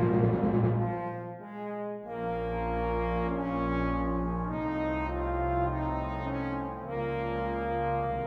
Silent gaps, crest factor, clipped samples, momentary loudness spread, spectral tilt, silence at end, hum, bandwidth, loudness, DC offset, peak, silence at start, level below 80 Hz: none; 18 dB; under 0.1%; 10 LU; -10 dB/octave; 0 s; none; 5.6 kHz; -31 LUFS; under 0.1%; -12 dBFS; 0 s; -40 dBFS